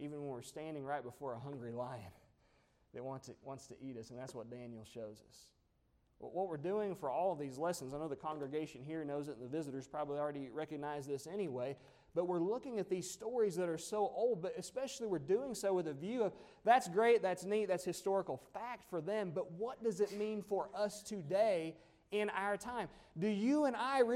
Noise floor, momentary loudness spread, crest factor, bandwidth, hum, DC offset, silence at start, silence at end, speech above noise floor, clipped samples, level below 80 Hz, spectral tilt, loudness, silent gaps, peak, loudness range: -76 dBFS; 15 LU; 20 dB; 16 kHz; none; under 0.1%; 0 s; 0 s; 37 dB; under 0.1%; -76 dBFS; -5.5 dB/octave; -39 LUFS; none; -18 dBFS; 13 LU